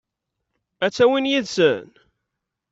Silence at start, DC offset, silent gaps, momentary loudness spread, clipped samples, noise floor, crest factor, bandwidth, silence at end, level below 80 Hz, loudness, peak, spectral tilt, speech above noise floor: 0.8 s; under 0.1%; none; 8 LU; under 0.1%; -81 dBFS; 18 dB; 8 kHz; 0.85 s; -64 dBFS; -20 LUFS; -4 dBFS; -4.5 dB/octave; 62 dB